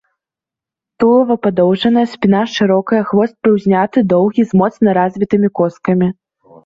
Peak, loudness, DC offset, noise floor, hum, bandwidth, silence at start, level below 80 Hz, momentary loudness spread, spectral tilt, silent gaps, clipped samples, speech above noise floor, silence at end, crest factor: -2 dBFS; -13 LUFS; under 0.1%; -87 dBFS; none; 7.4 kHz; 1 s; -52 dBFS; 3 LU; -7.5 dB/octave; none; under 0.1%; 74 dB; 0.55 s; 12 dB